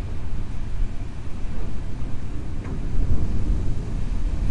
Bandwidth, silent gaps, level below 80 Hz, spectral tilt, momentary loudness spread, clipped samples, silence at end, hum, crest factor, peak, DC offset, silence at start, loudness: 7 kHz; none; -26 dBFS; -7.5 dB/octave; 7 LU; under 0.1%; 0 s; none; 14 dB; -6 dBFS; under 0.1%; 0 s; -31 LUFS